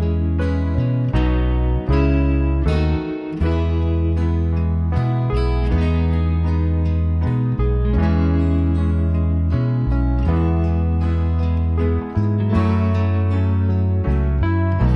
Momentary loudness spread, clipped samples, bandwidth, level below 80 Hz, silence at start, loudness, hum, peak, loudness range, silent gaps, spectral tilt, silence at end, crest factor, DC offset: 2 LU; under 0.1%; 5.6 kHz; -22 dBFS; 0 s; -19 LUFS; none; -6 dBFS; 1 LU; none; -10 dB/octave; 0 s; 12 dB; under 0.1%